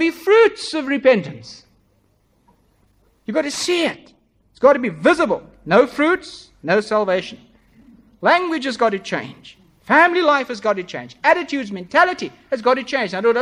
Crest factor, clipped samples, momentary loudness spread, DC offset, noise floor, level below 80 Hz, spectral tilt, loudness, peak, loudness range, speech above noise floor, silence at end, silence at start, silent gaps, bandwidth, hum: 18 dB; under 0.1%; 13 LU; under 0.1%; -61 dBFS; -58 dBFS; -4.5 dB/octave; -18 LUFS; 0 dBFS; 5 LU; 43 dB; 0 s; 0 s; none; 15 kHz; none